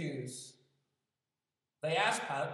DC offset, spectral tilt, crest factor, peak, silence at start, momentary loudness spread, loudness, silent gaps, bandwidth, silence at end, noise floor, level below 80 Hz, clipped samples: under 0.1%; -3.5 dB/octave; 22 dB; -16 dBFS; 0 s; 16 LU; -35 LUFS; none; 14.5 kHz; 0 s; under -90 dBFS; under -90 dBFS; under 0.1%